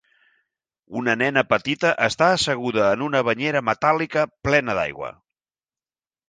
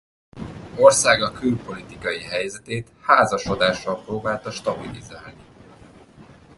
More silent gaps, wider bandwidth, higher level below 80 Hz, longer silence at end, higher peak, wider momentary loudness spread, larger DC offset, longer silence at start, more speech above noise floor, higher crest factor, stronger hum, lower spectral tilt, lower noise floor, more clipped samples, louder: neither; second, 9.8 kHz vs 11.5 kHz; about the same, -54 dBFS vs -50 dBFS; first, 1.15 s vs 0.35 s; about the same, -2 dBFS vs 0 dBFS; second, 7 LU vs 21 LU; neither; first, 0.9 s vs 0.35 s; first, over 69 dB vs 26 dB; about the same, 20 dB vs 22 dB; neither; about the same, -4.5 dB/octave vs -3.5 dB/octave; first, under -90 dBFS vs -47 dBFS; neither; about the same, -21 LUFS vs -21 LUFS